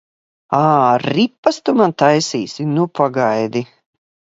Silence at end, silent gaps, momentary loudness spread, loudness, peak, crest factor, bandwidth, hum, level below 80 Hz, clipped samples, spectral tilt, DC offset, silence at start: 0.7 s; 1.38-1.43 s; 9 LU; -16 LUFS; 0 dBFS; 16 dB; 8 kHz; none; -62 dBFS; under 0.1%; -5.5 dB/octave; under 0.1%; 0.5 s